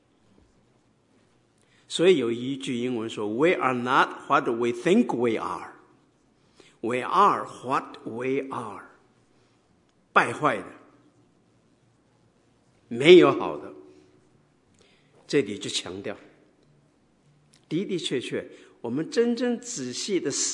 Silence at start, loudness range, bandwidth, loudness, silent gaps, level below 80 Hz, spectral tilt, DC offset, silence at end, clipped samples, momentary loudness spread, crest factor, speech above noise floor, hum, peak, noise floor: 1.9 s; 10 LU; 11 kHz; -24 LUFS; none; -76 dBFS; -4 dB/octave; under 0.1%; 0 s; under 0.1%; 16 LU; 26 dB; 40 dB; none; -2 dBFS; -64 dBFS